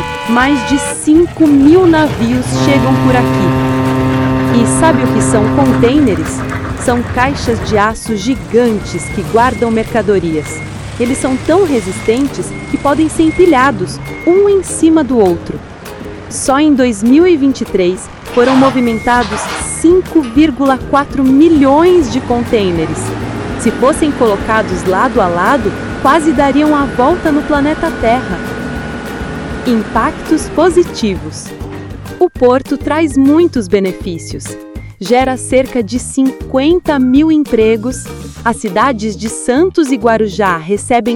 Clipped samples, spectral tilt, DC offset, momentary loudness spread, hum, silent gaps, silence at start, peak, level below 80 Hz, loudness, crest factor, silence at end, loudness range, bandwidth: 0.3%; -5.5 dB/octave; under 0.1%; 12 LU; none; none; 0 s; 0 dBFS; -32 dBFS; -11 LUFS; 12 dB; 0 s; 4 LU; 17 kHz